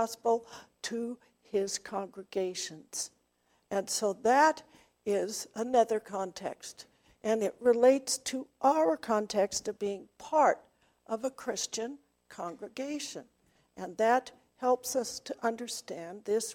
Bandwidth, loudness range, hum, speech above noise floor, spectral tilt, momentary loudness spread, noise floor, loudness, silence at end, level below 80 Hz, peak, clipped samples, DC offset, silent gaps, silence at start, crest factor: 17 kHz; 7 LU; none; 42 dB; -3 dB/octave; 15 LU; -73 dBFS; -31 LUFS; 0 s; -74 dBFS; -12 dBFS; under 0.1%; under 0.1%; none; 0 s; 20 dB